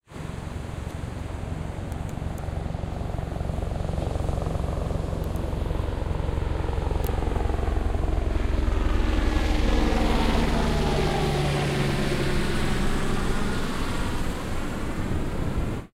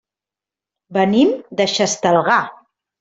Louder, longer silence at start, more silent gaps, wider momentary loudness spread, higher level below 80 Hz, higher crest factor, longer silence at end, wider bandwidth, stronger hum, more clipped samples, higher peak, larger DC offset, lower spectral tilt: second, -28 LUFS vs -16 LUFS; second, 0.1 s vs 0.9 s; neither; first, 9 LU vs 6 LU; first, -28 dBFS vs -60 dBFS; about the same, 16 dB vs 16 dB; second, 0.05 s vs 0.5 s; first, 15 kHz vs 8.2 kHz; neither; neither; second, -10 dBFS vs -2 dBFS; neither; first, -6 dB/octave vs -4 dB/octave